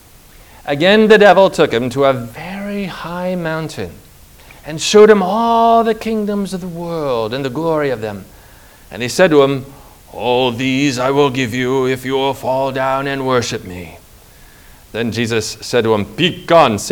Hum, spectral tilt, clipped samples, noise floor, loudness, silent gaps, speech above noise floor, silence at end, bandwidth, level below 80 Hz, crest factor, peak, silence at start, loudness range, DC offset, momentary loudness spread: none; -5 dB/octave; 0.3%; -42 dBFS; -14 LUFS; none; 28 dB; 0 s; over 20 kHz; -46 dBFS; 16 dB; 0 dBFS; 0.65 s; 6 LU; under 0.1%; 17 LU